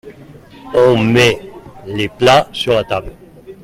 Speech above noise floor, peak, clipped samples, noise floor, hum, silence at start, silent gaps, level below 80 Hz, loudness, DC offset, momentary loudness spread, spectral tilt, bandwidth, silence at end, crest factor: 26 dB; 0 dBFS; under 0.1%; -38 dBFS; none; 0.05 s; none; -42 dBFS; -13 LUFS; under 0.1%; 14 LU; -5 dB/octave; 16 kHz; 0.1 s; 16 dB